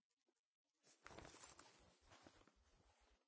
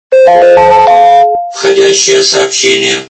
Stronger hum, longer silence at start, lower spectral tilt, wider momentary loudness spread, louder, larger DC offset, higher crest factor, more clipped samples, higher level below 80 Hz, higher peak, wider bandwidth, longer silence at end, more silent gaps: neither; first, 0.25 s vs 0.1 s; first, -3 dB/octave vs -1.5 dB/octave; about the same, 7 LU vs 5 LU; second, -64 LUFS vs -6 LUFS; neither; first, 28 dB vs 6 dB; second, under 0.1% vs 2%; second, -80 dBFS vs -42 dBFS; second, -42 dBFS vs 0 dBFS; second, 8 kHz vs 11 kHz; about the same, 0 s vs 0.05 s; first, 0.39-0.65 s vs none